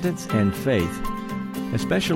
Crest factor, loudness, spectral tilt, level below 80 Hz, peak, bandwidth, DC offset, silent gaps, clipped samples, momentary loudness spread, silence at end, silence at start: 16 dB; -25 LUFS; -6 dB/octave; -42 dBFS; -8 dBFS; 17 kHz; under 0.1%; none; under 0.1%; 8 LU; 0 s; 0 s